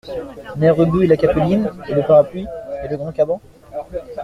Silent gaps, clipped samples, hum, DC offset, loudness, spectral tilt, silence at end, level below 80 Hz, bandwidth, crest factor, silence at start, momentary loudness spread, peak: none; under 0.1%; none; under 0.1%; -17 LUFS; -9 dB/octave; 0 s; -42 dBFS; 11 kHz; 16 dB; 0.05 s; 16 LU; -2 dBFS